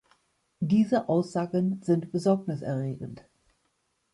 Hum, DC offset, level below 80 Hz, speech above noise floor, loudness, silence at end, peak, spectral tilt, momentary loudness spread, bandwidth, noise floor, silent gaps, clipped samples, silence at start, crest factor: none; under 0.1%; -66 dBFS; 48 dB; -27 LUFS; 0.95 s; -12 dBFS; -8 dB/octave; 11 LU; 11.5 kHz; -74 dBFS; none; under 0.1%; 0.6 s; 16 dB